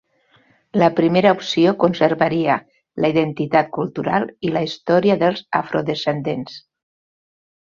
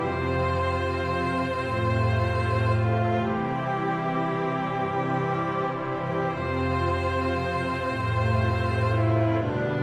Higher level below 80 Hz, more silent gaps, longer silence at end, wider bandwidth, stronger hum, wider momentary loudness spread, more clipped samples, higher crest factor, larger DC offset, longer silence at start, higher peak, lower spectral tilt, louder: second, -58 dBFS vs -44 dBFS; neither; first, 1.15 s vs 0 s; second, 7.4 kHz vs 9.4 kHz; neither; first, 9 LU vs 4 LU; neither; about the same, 18 dB vs 14 dB; neither; first, 0.75 s vs 0 s; first, -2 dBFS vs -12 dBFS; about the same, -7 dB/octave vs -8 dB/octave; first, -19 LUFS vs -26 LUFS